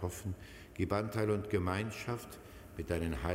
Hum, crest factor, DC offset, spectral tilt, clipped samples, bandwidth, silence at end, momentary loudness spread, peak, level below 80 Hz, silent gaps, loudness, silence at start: none; 20 dB; under 0.1%; -6.5 dB/octave; under 0.1%; 16 kHz; 0 s; 16 LU; -18 dBFS; -50 dBFS; none; -37 LUFS; 0 s